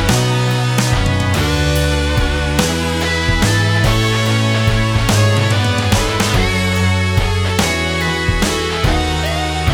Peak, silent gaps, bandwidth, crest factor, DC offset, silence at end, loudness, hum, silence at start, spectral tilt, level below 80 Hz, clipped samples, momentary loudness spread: -2 dBFS; none; 19 kHz; 14 dB; under 0.1%; 0 s; -15 LUFS; none; 0 s; -4.5 dB/octave; -24 dBFS; under 0.1%; 3 LU